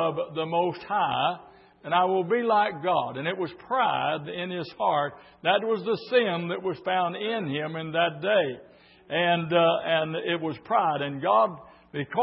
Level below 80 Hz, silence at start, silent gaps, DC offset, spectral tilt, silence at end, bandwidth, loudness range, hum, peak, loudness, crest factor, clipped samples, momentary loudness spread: -70 dBFS; 0 s; none; under 0.1%; -9.5 dB/octave; 0 s; 5.8 kHz; 2 LU; none; -8 dBFS; -26 LUFS; 18 dB; under 0.1%; 9 LU